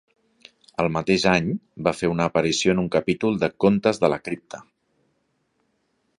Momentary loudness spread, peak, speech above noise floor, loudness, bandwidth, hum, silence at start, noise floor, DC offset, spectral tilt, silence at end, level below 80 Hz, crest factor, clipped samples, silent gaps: 13 LU; -2 dBFS; 49 dB; -22 LUFS; 11 kHz; none; 0.8 s; -70 dBFS; under 0.1%; -5.5 dB/octave; 1.55 s; -52 dBFS; 22 dB; under 0.1%; none